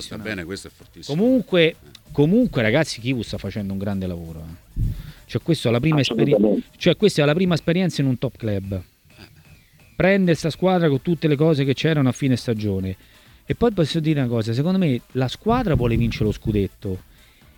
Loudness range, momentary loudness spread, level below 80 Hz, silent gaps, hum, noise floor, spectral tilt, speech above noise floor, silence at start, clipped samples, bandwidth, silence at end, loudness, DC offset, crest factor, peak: 3 LU; 13 LU; -40 dBFS; none; none; -50 dBFS; -6.5 dB/octave; 30 dB; 0 s; under 0.1%; 18.5 kHz; 0.55 s; -21 LUFS; under 0.1%; 18 dB; -4 dBFS